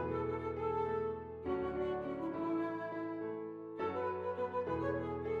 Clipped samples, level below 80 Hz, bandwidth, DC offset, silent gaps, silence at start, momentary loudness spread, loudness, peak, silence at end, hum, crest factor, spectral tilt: under 0.1%; -64 dBFS; 6.8 kHz; under 0.1%; none; 0 s; 4 LU; -39 LUFS; -26 dBFS; 0 s; none; 12 dB; -9 dB/octave